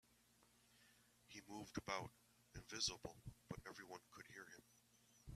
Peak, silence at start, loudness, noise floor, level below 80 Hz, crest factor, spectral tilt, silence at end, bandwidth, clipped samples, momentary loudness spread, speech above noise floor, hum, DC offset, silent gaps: -28 dBFS; 0.1 s; -51 LUFS; -76 dBFS; -72 dBFS; 26 dB; -2.5 dB/octave; 0 s; 15 kHz; under 0.1%; 18 LU; 23 dB; 60 Hz at -75 dBFS; under 0.1%; none